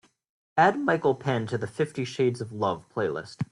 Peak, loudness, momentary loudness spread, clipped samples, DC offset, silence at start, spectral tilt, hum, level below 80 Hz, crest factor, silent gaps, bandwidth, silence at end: -8 dBFS; -27 LUFS; 9 LU; under 0.1%; under 0.1%; 0.55 s; -6.5 dB/octave; none; -66 dBFS; 18 dB; none; 11.5 kHz; 0.1 s